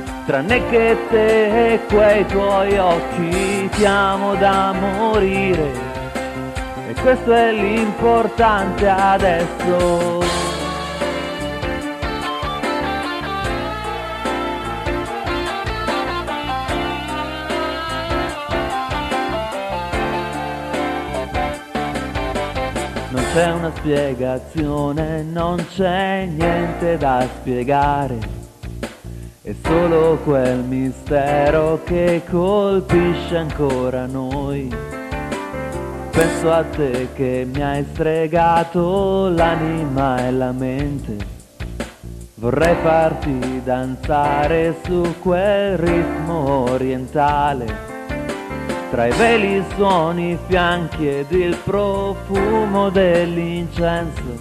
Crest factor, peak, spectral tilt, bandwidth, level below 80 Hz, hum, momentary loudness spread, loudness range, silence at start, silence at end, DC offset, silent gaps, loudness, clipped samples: 16 dB; -2 dBFS; -6 dB/octave; 14.5 kHz; -34 dBFS; none; 10 LU; 6 LU; 0 s; 0 s; under 0.1%; none; -19 LUFS; under 0.1%